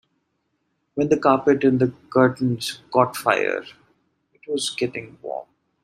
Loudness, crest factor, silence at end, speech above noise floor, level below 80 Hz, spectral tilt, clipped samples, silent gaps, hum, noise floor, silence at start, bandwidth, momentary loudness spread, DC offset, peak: -21 LUFS; 20 dB; 0.4 s; 52 dB; -64 dBFS; -5.5 dB/octave; under 0.1%; none; none; -73 dBFS; 0.95 s; 15 kHz; 15 LU; under 0.1%; -2 dBFS